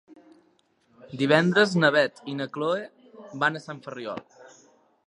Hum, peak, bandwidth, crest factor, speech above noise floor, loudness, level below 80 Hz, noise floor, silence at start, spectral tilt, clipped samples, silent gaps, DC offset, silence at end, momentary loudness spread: none; -4 dBFS; 11 kHz; 24 dB; 41 dB; -24 LUFS; -74 dBFS; -66 dBFS; 1.1 s; -5.5 dB/octave; under 0.1%; none; under 0.1%; 0.65 s; 19 LU